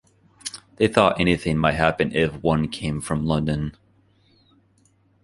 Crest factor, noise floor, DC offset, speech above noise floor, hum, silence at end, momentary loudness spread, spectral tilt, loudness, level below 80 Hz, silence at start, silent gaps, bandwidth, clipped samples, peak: 22 dB; -61 dBFS; under 0.1%; 40 dB; none; 1.5 s; 16 LU; -6 dB/octave; -22 LUFS; -42 dBFS; 0.45 s; none; 11.5 kHz; under 0.1%; -2 dBFS